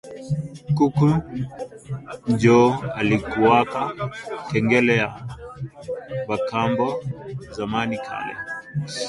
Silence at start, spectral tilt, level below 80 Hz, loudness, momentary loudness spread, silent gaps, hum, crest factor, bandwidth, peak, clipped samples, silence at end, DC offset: 0.05 s; -6.5 dB/octave; -50 dBFS; -22 LUFS; 16 LU; none; none; 20 dB; 11.5 kHz; -2 dBFS; under 0.1%; 0 s; under 0.1%